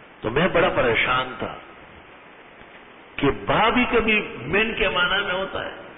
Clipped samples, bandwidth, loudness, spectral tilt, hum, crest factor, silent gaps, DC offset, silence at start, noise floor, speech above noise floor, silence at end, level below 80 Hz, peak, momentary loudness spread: under 0.1%; 4 kHz; -21 LUFS; -9.5 dB/octave; none; 16 dB; none; under 0.1%; 0 s; -46 dBFS; 24 dB; 0 s; -44 dBFS; -8 dBFS; 12 LU